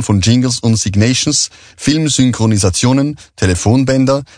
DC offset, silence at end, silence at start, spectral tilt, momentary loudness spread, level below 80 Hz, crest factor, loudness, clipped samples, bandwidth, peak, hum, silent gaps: under 0.1%; 0.15 s; 0 s; -4.5 dB/octave; 5 LU; -38 dBFS; 12 dB; -13 LUFS; under 0.1%; 10 kHz; 0 dBFS; none; none